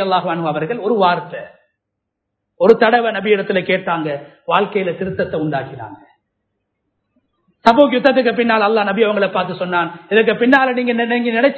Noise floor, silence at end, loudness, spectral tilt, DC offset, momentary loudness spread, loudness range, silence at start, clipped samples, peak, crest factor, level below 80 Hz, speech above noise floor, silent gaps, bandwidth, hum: -77 dBFS; 0 s; -15 LUFS; -7 dB/octave; under 0.1%; 10 LU; 7 LU; 0 s; under 0.1%; 0 dBFS; 16 dB; -58 dBFS; 61 dB; none; 8 kHz; none